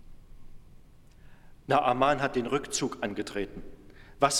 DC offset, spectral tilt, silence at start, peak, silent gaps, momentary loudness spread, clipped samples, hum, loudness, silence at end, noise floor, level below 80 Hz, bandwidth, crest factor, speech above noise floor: under 0.1%; -3.5 dB/octave; 0.05 s; -8 dBFS; none; 13 LU; under 0.1%; none; -29 LUFS; 0 s; -52 dBFS; -52 dBFS; 16 kHz; 22 dB; 24 dB